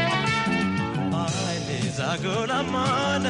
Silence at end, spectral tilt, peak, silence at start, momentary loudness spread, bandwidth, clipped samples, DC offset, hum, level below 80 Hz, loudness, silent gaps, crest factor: 0 s; -5 dB/octave; -12 dBFS; 0 s; 4 LU; 11.5 kHz; under 0.1%; under 0.1%; none; -52 dBFS; -25 LUFS; none; 12 dB